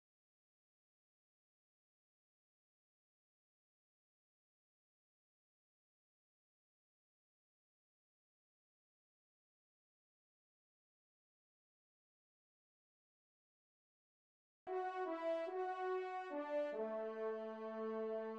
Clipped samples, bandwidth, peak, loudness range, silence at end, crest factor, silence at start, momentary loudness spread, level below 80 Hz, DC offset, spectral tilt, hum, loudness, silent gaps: under 0.1%; 8.2 kHz; -32 dBFS; 8 LU; 0 s; 18 dB; 14.65 s; 4 LU; under -90 dBFS; under 0.1%; -6 dB/octave; none; -44 LUFS; none